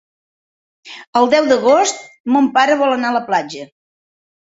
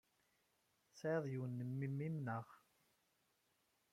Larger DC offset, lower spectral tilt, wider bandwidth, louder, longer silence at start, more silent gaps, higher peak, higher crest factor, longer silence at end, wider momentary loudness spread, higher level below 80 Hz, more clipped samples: neither; second, -3 dB/octave vs -8.5 dB/octave; second, 8 kHz vs 14 kHz; first, -14 LUFS vs -45 LUFS; about the same, 0.85 s vs 0.95 s; first, 1.07-1.13 s, 2.20-2.24 s vs none; first, 0 dBFS vs -30 dBFS; about the same, 16 dB vs 18 dB; second, 0.95 s vs 1.35 s; first, 17 LU vs 6 LU; first, -62 dBFS vs -86 dBFS; neither